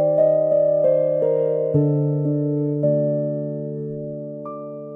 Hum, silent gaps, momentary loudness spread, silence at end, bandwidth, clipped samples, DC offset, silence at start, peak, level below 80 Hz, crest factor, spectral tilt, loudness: none; none; 14 LU; 0 s; 2.8 kHz; under 0.1%; under 0.1%; 0 s; -8 dBFS; -64 dBFS; 12 dB; -13.5 dB/octave; -20 LUFS